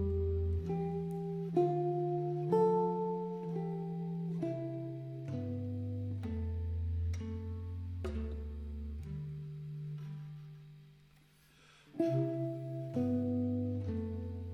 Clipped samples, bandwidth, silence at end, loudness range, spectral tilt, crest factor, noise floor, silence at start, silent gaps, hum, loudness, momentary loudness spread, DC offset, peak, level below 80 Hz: under 0.1%; 6.6 kHz; 0 s; 10 LU; -10 dB/octave; 18 dB; -64 dBFS; 0 s; none; none; -37 LUFS; 11 LU; under 0.1%; -18 dBFS; -52 dBFS